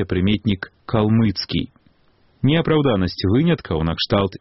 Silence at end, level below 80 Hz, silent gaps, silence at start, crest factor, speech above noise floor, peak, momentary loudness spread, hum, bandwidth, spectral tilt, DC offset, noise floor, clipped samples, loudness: 0.05 s; -40 dBFS; none; 0 s; 16 dB; 39 dB; -2 dBFS; 7 LU; none; 6 kHz; -5.5 dB/octave; under 0.1%; -57 dBFS; under 0.1%; -20 LUFS